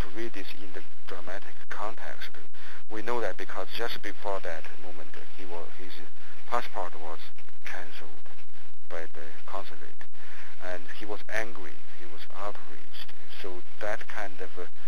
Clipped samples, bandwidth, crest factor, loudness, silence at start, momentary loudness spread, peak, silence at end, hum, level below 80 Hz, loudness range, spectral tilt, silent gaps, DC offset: under 0.1%; 15 kHz; 28 dB; -39 LUFS; 0 s; 15 LU; -10 dBFS; 0 s; none; -66 dBFS; 7 LU; -5.5 dB/octave; none; 20%